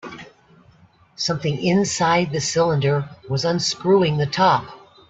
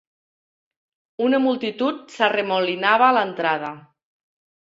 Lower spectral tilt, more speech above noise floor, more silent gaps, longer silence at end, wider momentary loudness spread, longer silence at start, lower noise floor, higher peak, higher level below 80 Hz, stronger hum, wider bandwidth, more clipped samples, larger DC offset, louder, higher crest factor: about the same, -5 dB/octave vs -5 dB/octave; second, 34 dB vs over 70 dB; neither; second, 0.3 s vs 0.85 s; about the same, 9 LU vs 9 LU; second, 0.05 s vs 1.2 s; second, -53 dBFS vs under -90 dBFS; about the same, -4 dBFS vs -2 dBFS; first, -56 dBFS vs -72 dBFS; neither; about the same, 8.4 kHz vs 7.8 kHz; neither; neither; about the same, -20 LUFS vs -20 LUFS; about the same, 16 dB vs 20 dB